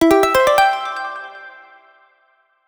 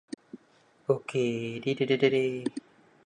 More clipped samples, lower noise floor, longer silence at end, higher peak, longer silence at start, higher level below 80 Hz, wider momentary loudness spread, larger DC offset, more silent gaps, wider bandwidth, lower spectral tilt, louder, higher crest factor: neither; about the same, -60 dBFS vs -63 dBFS; first, 1.2 s vs 0.45 s; first, 0 dBFS vs -10 dBFS; second, 0 s vs 0.35 s; first, -50 dBFS vs -74 dBFS; about the same, 21 LU vs 19 LU; neither; neither; first, over 20 kHz vs 10 kHz; second, -3.5 dB/octave vs -6 dB/octave; first, -16 LUFS vs -29 LUFS; about the same, 18 dB vs 20 dB